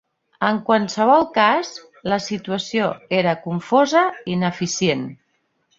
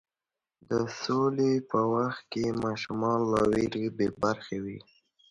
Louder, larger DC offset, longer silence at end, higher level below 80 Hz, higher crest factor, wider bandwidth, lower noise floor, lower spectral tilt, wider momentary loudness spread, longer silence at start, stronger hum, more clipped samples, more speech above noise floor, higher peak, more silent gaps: first, -19 LUFS vs -29 LUFS; neither; first, 0.65 s vs 0.5 s; about the same, -60 dBFS vs -58 dBFS; about the same, 18 dB vs 16 dB; second, 7.8 kHz vs 11.5 kHz; second, -68 dBFS vs under -90 dBFS; second, -4.5 dB/octave vs -6.5 dB/octave; about the same, 10 LU vs 8 LU; second, 0.4 s vs 0.7 s; neither; neither; second, 49 dB vs over 62 dB; first, -2 dBFS vs -12 dBFS; neither